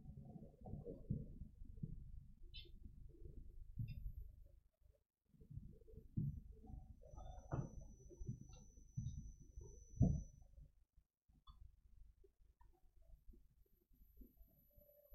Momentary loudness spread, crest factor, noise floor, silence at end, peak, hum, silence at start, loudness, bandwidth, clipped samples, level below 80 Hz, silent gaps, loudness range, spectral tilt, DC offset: 20 LU; 28 dB; -76 dBFS; 0 s; -24 dBFS; none; 0 s; -51 LUFS; 12 kHz; under 0.1%; -58 dBFS; none; 10 LU; -8 dB/octave; under 0.1%